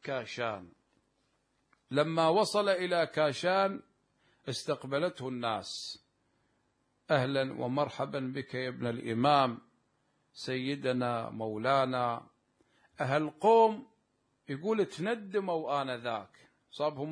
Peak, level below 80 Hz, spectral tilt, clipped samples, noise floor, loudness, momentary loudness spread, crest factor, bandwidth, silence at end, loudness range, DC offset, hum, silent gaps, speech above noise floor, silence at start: -12 dBFS; -78 dBFS; -5.5 dB/octave; under 0.1%; -76 dBFS; -32 LUFS; 13 LU; 20 dB; 11 kHz; 0 s; 5 LU; under 0.1%; none; none; 45 dB; 0.05 s